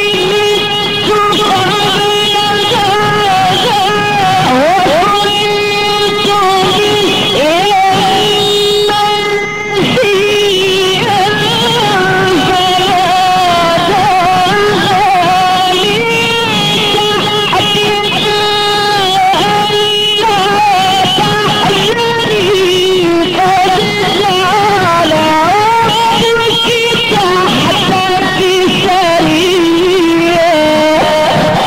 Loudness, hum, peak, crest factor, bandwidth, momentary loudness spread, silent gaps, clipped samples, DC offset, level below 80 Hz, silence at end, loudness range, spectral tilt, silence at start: -9 LUFS; none; -4 dBFS; 4 dB; 16.5 kHz; 2 LU; none; under 0.1%; 1%; -38 dBFS; 0 s; 1 LU; -3.5 dB/octave; 0 s